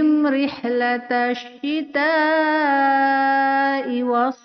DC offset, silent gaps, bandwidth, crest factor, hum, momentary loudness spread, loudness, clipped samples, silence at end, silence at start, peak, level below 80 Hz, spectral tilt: under 0.1%; none; 6.4 kHz; 12 dB; none; 6 LU; -19 LUFS; under 0.1%; 0.1 s; 0 s; -8 dBFS; -70 dBFS; -0.5 dB/octave